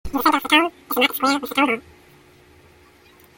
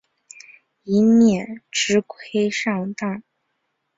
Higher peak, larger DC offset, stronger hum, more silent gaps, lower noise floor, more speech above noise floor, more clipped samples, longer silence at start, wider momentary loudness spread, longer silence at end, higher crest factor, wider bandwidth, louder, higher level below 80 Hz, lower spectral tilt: first, -2 dBFS vs -6 dBFS; neither; neither; neither; second, -51 dBFS vs -74 dBFS; second, 32 dB vs 54 dB; neither; second, 0.05 s vs 0.85 s; second, 6 LU vs 13 LU; first, 1.55 s vs 0.75 s; about the same, 20 dB vs 16 dB; first, 17 kHz vs 7.8 kHz; about the same, -19 LUFS vs -20 LUFS; first, -48 dBFS vs -62 dBFS; second, -2.5 dB/octave vs -4.5 dB/octave